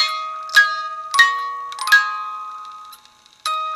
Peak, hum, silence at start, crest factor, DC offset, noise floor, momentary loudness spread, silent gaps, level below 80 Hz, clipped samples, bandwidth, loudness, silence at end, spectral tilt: 0 dBFS; none; 0 s; 20 dB; under 0.1%; -50 dBFS; 18 LU; none; -70 dBFS; under 0.1%; 15.5 kHz; -17 LUFS; 0 s; 3.5 dB/octave